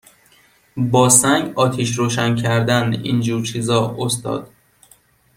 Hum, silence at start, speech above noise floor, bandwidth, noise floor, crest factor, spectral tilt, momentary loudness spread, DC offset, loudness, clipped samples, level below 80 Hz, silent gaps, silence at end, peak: none; 0.75 s; 37 dB; 16.5 kHz; -54 dBFS; 18 dB; -4 dB/octave; 11 LU; under 0.1%; -17 LUFS; under 0.1%; -54 dBFS; none; 0.9 s; 0 dBFS